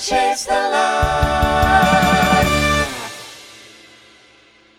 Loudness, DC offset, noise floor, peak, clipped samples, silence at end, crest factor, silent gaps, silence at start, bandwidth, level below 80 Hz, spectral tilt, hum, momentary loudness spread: -15 LUFS; under 0.1%; -50 dBFS; -2 dBFS; under 0.1%; 1.2 s; 16 dB; none; 0 s; over 20 kHz; -30 dBFS; -4 dB/octave; none; 17 LU